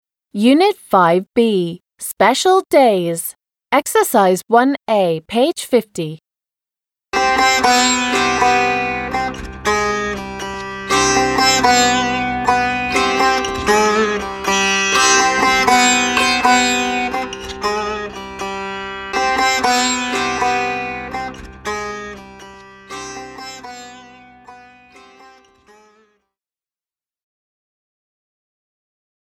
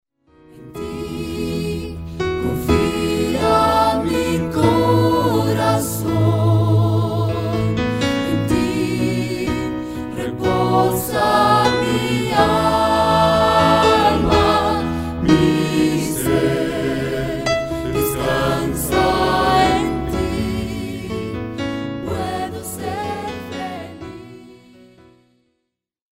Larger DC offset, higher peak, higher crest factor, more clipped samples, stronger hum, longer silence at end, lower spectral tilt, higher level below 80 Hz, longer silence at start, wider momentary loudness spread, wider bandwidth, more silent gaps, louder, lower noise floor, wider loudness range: neither; about the same, 0 dBFS vs 0 dBFS; about the same, 16 dB vs 18 dB; neither; neither; first, 4.7 s vs 1.6 s; second, -2.5 dB/octave vs -5.5 dB/octave; second, -44 dBFS vs -36 dBFS; second, 0.35 s vs 0.55 s; first, 15 LU vs 12 LU; first, 18.5 kHz vs 16 kHz; neither; first, -15 LUFS vs -18 LUFS; first, under -90 dBFS vs -75 dBFS; first, 14 LU vs 10 LU